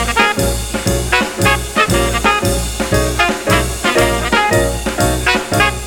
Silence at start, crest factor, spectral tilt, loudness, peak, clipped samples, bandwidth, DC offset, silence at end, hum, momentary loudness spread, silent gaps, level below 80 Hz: 0 s; 14 dB; -3.5 dB/octave; -14 LUFS; 0 dBFS; under 0.1%; over 20 kHz; under 0.1%; 0 s; none; 4 LU; none; -24 dBFS